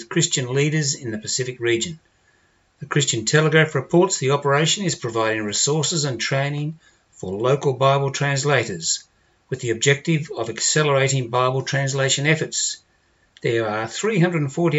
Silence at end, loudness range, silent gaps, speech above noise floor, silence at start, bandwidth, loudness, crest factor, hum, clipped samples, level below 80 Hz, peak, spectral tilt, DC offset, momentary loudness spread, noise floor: 0 s; 3 LU; none; 41 dB; 0 s; 8.2 kHz; -20 LUFS; 20 dB; none; under 0.1%; -64 dBFS; -2 dBFS; -4 dB/octave; under 0.1%; 7 LU; -61 dBFS